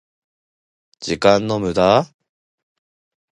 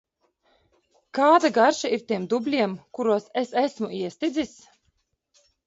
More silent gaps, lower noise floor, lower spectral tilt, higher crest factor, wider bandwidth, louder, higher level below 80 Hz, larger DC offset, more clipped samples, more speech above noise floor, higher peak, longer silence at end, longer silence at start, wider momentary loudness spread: neither; first, under -90 dBFS vs -72 dBFS; about the same, -5.5 dB/octave vs -4.5 dB/octave; about the same, 20 dB vs 20 dB; first, 11 kHz vs 8 kHz; first, -17 LUFS vs -24 LUFS; first, -50 dBFS vs -68 dBFS; neither; neither; first, over 74 dB vs 49 dB; first, 0 dBFS vs -6 dBFS; about the same, 1.3 s vs 1.2 s; second, 1 s vs 1.15 s; first, 15 LU vs 12 LU